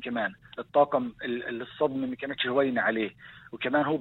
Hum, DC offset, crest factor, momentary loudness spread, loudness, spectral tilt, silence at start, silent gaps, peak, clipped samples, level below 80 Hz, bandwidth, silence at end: none; under 0.1%; 18 dB; 11 LU; -28 LUFS; -8 dB/octave; 0 s; none; -10 dBFS; under 0.1%; -66 dBFS; 4.2 kHz; 0 s